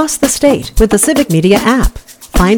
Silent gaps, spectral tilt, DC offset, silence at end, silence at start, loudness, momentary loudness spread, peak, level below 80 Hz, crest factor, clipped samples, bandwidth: none; -4.5 dB/octave; under 0.1%; 0 s; 0 s; -11 LUFS; 5 LU; 0 dBFS; -20 dBFS; 10 dB; under 0.1%; 19.5 kHz